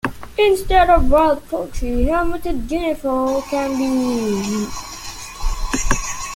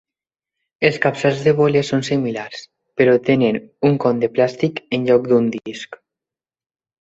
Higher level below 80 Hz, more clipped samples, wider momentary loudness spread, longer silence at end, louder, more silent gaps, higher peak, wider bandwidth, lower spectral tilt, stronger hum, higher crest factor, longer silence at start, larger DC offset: first, -26 dBFS vs -58 dBFS; neither; about the same, 14 LU vs 15 LU; second, 0 s vs 1.05 s; about the same, -19 LUFS vs -17 LUFS; neither; about the same, -2 dBFS vs -2 dBFS; first, 17 kHz vs 8 kHz; second, -4.5 dB/octave vs -6.5 dB/octave; neither; about the same, 16 dB vs 18 dB; second, 0.05 s vs 0.8 s; neither